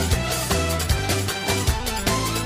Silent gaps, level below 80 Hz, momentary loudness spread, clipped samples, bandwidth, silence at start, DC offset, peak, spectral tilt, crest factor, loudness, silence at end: none; -30 dBFS; 1 LU; under 0.1%; 15.5 kHz; 0 s; under 0.1%; -8 dBFS; -3.5 dB/octave; 14 dB; -22 LUFS; 0 s